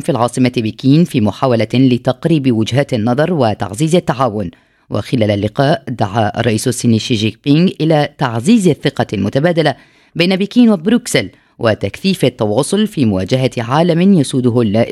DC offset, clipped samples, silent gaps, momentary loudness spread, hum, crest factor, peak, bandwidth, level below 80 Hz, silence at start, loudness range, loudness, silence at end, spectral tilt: under 0.1%; under 0.1%; none; 6 LU; none; 14 dB; 0 dBFS; 14 kHz; -50 dBFS; 0 s; 2 LU; -14 LUFS; 0 s; -6 dB/octave